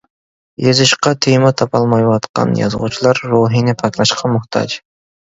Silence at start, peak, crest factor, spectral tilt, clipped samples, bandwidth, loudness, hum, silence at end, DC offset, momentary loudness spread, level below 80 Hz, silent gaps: 0.6 s; 0 dBFS; 14 dB; -5 dB/octave; under 0.1%; 8 kHz; -14 LUFS; none; 0.45 s; under 0.1%; 7 LU; -50 dBFS; 2.29-2.34 s